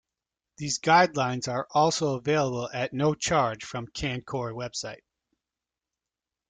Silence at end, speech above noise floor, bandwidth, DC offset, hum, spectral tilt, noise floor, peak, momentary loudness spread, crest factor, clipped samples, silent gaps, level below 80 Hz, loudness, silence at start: 1.55 s; 63 dB; 9.6 kHz; under 0.1%; none; -4 dB/octave; -89 dBFS; -6 dBFS; 14 LU; 22 dB; under 0.1%; none; -56 dBFS; -27 LUFS; 0.6 s